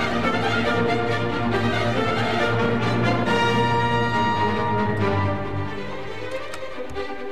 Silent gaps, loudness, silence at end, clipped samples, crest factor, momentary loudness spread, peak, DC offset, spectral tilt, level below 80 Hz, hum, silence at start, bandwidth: none; -22 LUFS; 0 s; under 0.1%; 16 dB; 11 LU; -6 dBFS; 2%; -6 dB/octave; -44 dBFS; none; 0 s; 13 kHz